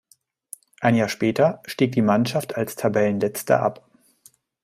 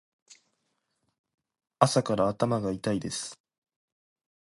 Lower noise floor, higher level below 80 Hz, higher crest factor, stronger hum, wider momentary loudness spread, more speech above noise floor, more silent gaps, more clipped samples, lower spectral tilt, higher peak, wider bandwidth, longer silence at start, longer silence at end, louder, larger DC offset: second, -61 dBFS vs -78 dBFS; about the same, -62 dBFS vs -62 dBFS; second, 20 dB vs 28 dB; neither; second, 8 LU vs 11 LU; second, 40 dB vs 51 dB; neither; neither; about the same, -6 dB/octave vs -5.5 dB/octave; about the same, -2 dBFS vs -2 dBFS; first, 16 kHz vs 11.5 kHz; second, 0.8 s vs 1.8 s; second, 0.9 s vs 1.05 s; first, -22 LUFS vs -28 LUFS; neither